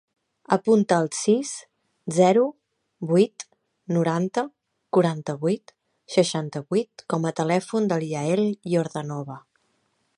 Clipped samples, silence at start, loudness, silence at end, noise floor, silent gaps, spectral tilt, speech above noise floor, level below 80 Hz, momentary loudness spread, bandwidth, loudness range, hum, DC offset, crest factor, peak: under 0.1%; 0.5 s; -24 LUFS; 0.8 s; -70 dBFS; none; -6 dB/octave; 48 dB; -74 dBFS; 14 LU; 11.5 kHz; 3 LU; none; under 0.1%; 20 dB; -4 dBFS